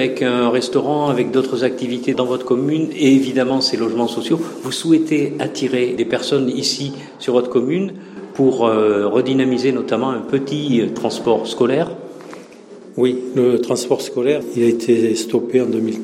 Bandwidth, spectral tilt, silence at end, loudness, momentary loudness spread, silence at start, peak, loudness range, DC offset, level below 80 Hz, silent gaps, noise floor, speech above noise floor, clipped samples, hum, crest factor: 15 kHz; -5.5 dB/octave; 0 s; -18 LUFS; 7 LU; 0 s; -2 dBFS; 2 LU; under 0.1%; -64 dBFS; none; -39 dBFS; 22 dB; under 0.1%; none; 14 dB